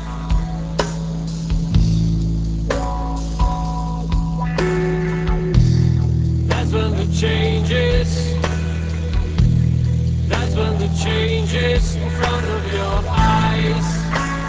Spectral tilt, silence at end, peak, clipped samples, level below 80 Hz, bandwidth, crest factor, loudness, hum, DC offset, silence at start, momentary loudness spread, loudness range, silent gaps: -6.5 dB/octave; 0 s; 0 dBFS; under 0.1%; -22 dBFS; 8 kHz; 16 dB; -19 LUFS; none; under 0.1%; 0 s; 6 LU; 3 LU; none